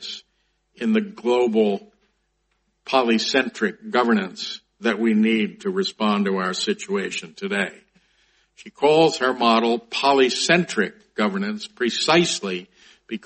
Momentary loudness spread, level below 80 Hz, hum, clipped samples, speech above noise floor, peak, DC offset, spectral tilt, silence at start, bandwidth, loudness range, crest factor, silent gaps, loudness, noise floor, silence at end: 11 LU; -68 dBFS; none; under 0.1%; 49 dB; -2 dBFS; under 0.1%; -4 dB/octave; 0 s; 8.8 kHz; 4 LU; 20 dB; none; -21 LUFS; -70 dBFS; 0.05 s